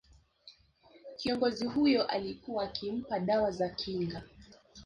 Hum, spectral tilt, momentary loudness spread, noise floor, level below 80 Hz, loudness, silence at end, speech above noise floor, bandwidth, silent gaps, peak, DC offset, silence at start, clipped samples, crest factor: none; -6 dB/octave; 10 LU; -62 dBFS; -62 dBFS; -32 LUFS; 0 s; 30 dB; 10.5 kHz; none; -18 dBFS; under 0.1%; 0.45 s; under 0.1%; 16 dB